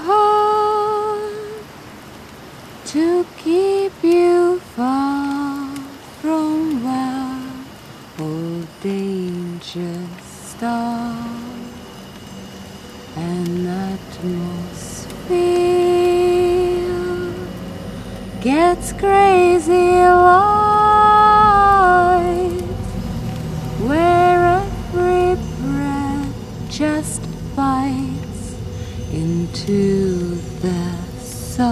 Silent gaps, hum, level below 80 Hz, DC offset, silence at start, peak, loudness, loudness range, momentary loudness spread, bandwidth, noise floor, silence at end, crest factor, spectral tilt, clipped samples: none; none; -38 dBFS; under 0.1%; 0 s; 0 dBFS; -17 LUFS; 14 LU; 21 LU; 14.5 kHz; -38 dBFS; 0 s; 18 dB; -6 dB/octave; under 0.1%